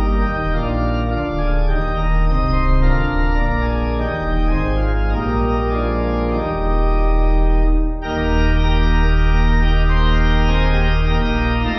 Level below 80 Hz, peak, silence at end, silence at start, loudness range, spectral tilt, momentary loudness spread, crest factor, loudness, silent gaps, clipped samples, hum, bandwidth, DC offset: -16 dBFS; -4 dBFS; 0 s; 0 s; 2 LU; -8 dB/octave; 4 LU; 10 dB; -19 LUFS; none; under 0.1%; none; 6 kHz; under 0.1%